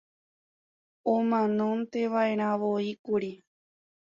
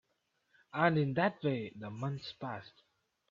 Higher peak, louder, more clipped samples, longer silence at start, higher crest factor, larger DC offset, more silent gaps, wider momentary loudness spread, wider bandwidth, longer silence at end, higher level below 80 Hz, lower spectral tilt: about the same, -14 dBFS vs -14 dBFS; first, -28 LUFS vs -35 LUFS; neither; first, 1.05 s vs 0.75 s; second, 16 dB vs 22 dB; neither; first, 2.99-3.04 s vs none; second, 6 LU vs 13 LU; about the same, 7.2 kHz vs 7.4 kHz; about the same, 0.7 s vs 0.6 s; about the same, -74 dBFS vs -76 dBFS; about the same, -7.5 dB/octave vs -8 dB/octave